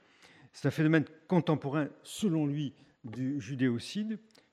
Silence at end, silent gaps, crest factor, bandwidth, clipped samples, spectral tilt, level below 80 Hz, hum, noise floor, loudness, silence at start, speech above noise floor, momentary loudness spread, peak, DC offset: 0.35 s; none; 20 dB; 13.5 kHz; under 0.1%; -6.5 dB/octave; -74 dBFS; none; -59 dBFS; -32 LUFS; 0.55 s; 28 dB; 12 LU; -12 dBFS; under 0.1%